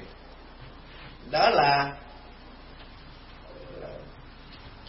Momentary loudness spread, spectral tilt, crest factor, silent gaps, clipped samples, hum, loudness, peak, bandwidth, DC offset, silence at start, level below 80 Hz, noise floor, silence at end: 26 LU; -8 dB/octave; 22 dB; none; under 0.1%; none; -23 LUFS; -8 dBFS; 5.8 kHz; under 0.1%; 0 s; -50 dBFS; -47 dBFS; 0.1 s